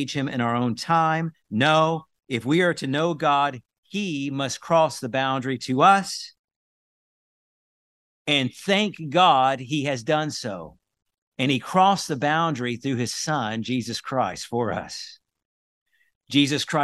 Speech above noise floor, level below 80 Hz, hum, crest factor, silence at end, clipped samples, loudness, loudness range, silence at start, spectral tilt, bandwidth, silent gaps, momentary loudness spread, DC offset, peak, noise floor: over 67 dB; -66 dBFS; none; 20 dB; 0 s; under 0.1%; -23 LUFS; 5 LU; 0 s; -4.5 dB/octave; 12.5 kHz; 3.78-3.83 s, 6.39-6.48 s, 6.56-8.25 s, 11.18-11.32 s, 15.45-15.86 s, 16.15-16.21 s; 12 LU; under 0.1%; -4 dBFS; under -90 dBFS